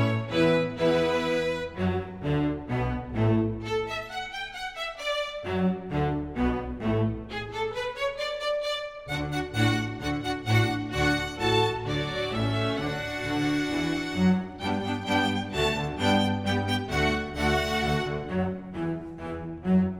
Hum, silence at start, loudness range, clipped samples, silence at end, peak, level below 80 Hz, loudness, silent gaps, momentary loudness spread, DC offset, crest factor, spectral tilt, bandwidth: none; 0 s; 3 LU; under 0.1%; 0 s; -10 dBFS; -44 dBFS; -28 LUFS; none; 8 LU; under 0.1%; 16 dB; -6 dB/octave; 16.5 kHz